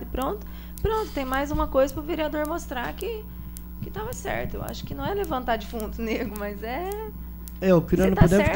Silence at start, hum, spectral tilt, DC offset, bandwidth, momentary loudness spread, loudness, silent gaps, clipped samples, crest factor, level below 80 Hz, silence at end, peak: 0 s; none; -6.5 dB/octave; under 0.1%; 16.5 kHz; 15 LU; -27 LUFS; none; under 0.1%; 20 dB; -36 dBFS; 0 s; -6 dBFS